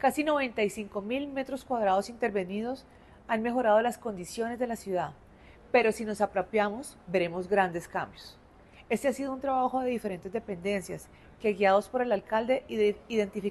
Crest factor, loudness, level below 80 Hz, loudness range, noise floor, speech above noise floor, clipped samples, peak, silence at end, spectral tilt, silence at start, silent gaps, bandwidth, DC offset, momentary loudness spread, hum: 18 dB; -30 LUFS; -60 dBFS; 2 LU; -55 dBFS; 25 dB; under 0.1%; -12 dBFS; 0 s; -5 dB/octave; 0 s; none; 13 kHz; under 0.1%; 11 LU; none